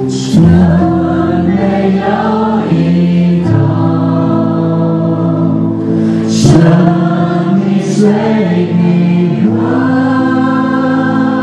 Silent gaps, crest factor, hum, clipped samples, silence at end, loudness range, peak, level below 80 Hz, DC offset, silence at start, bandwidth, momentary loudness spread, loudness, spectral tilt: none; 10 dB; none; 0.3%; 0 s; 1 LU; 0 dBFS; -38 dBFS; under 0.1%; 0 s; 9.4 kHz; 4 LU; -10 LUFS; -7.5 dB/octave